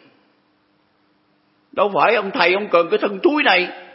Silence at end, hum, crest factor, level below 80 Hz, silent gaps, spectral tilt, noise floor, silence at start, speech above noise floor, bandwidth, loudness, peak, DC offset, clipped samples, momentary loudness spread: 0.1 s; none; 20 dB; -76 dBFS; none; -8 dB/octave; -61 dBFS; 1.75 s; 44 dB; 5.8 kHz; -17 LUFS; 0 dBFS; under 0.1%; under 0.1%; 5 LU